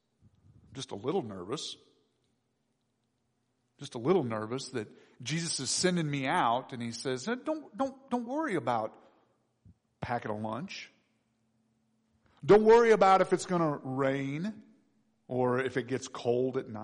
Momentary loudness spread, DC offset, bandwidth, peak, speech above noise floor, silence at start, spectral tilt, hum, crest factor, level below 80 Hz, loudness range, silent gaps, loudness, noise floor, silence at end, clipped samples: 19 LU; under 0.1%; 10.5 kHz; -14 dBFS; 49 dB; 0.7 s; -5 dB/octave; none; 18 dB; -68 dBFS; 14 LU; none; -30 LUFS; -78 dBFS; 0 s; under 0.1%